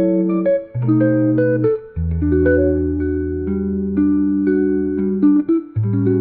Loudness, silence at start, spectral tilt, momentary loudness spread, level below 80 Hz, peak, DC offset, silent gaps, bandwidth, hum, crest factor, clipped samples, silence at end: -17 LUFS; 0 s; -15 dB/octave; 6 LU; -36 dBFS; -4 dBFS; 0.2%; none; 2.6 kHz; none; 12 dB; under 0.1%; 0 s